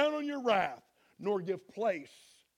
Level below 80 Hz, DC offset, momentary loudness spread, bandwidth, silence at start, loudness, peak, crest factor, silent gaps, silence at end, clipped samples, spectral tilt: -78 dBFS; under 0.1%; 12 LU; 14.5 kHz; 0 s; -34 LUFS; -14 dBFS; 20 dB; none; 0.5 s; under 0.1%; -5.5 dB/octave